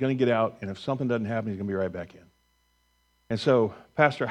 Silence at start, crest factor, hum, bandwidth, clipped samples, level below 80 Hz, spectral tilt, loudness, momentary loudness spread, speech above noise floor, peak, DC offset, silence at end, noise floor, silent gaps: 0 s; 22 dB; 60 Hz at -60 dBFS; 10.5 kHz; under 0.1%; -64 dBFS; -7 dB/octave; -27 LUFS; 11 LU; 43 dB; -6 dBFS; under 0.1%; 0 s; -69 dBFS; none